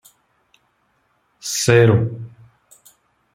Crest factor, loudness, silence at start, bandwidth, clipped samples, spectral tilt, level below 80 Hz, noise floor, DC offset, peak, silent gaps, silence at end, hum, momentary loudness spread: 20 dB; -16 LUFS; 1.45 s; 15.5 kHz; under 0.1%; -5 dB/octave; -54 dBFS; -65 dBFS; under 0.1%; 0 dBFS; none; 1.05 s; none; 22 LU